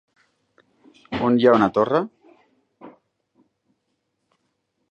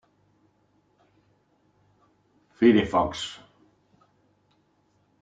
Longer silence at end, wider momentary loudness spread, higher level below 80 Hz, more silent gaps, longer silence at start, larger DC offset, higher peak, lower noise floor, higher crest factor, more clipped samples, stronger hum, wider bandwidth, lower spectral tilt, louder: first, 2.05 s vs 1.9 s; about the same, 15 LU vs 17 LU; about the same, -60 dBFS vs -58 dBFS; neither; second, 1.1 s vs 2.6 s; neither; first, -2 dBFS vs -6 dBFS; first, -74 dBFS vs -67 dBFS; about the same, 22 dB vs 22 dB; neither; second, none vs 50 Hz at -65 dBFS; second, 7 kHz vs 9.2 kHz; first, -7.5 dB/octave vs -6 dB/octave; first, -19 LUFS vs -23 LUFS